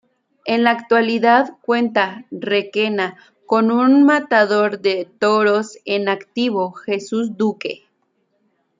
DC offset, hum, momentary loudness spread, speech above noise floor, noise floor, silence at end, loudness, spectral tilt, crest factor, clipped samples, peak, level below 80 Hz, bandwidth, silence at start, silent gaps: under 0.1%; none; 10 LU; 50 dB; -67 dBFS; 1.05 s; -17 LUFS; -5.5 dB/octave; 16 dB; under 0.1%; -2 dBFS; -70 dBFS; 7.6 kHz; 0.45 s; none